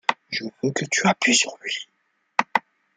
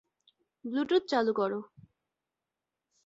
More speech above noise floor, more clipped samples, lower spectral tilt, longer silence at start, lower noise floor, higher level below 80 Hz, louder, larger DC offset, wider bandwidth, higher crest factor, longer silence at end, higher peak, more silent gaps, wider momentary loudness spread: second, 38 dB vs 59 dB; neither; second, -2.5 dB/octave vs -5.5 dB/octave; second, 0.1 s vs 0.65 s; second, -61 dBFS vs -89 dBFS; first, -70 dBFS vs -78 dBFS; first, -23 LUFS vs -30 LUFS; neither; first, 10 kHz vs 7.8 kHz; about the same, 24 dB vs 20 dB; second, 0.35 s vs 1.4 s; first, 0 dBFS vs -14 dBFS; neither; about the same, 12 LU vs 12 LU